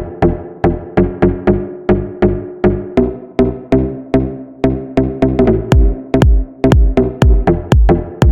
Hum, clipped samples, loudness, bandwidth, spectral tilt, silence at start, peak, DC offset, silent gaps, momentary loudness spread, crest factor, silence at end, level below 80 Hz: none; under 0.1%; -14 LUFS; 8.6 kHz; -8.5 dB/octave; 0 s; 0 dBFS; under 0.1%; none; 5 LU; 12 dB; 0 s; -18 dBFS